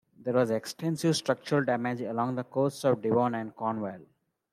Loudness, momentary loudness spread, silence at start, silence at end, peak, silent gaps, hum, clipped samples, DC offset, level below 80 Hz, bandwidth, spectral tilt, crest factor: -29 LUFS; 6 LU; 0.2 s; 0.5 s; -12 dBFS; none; none; under 0.1%; under 0.1%; -74 dBFS; 15 kHz; -6 dB/octave; 18 dB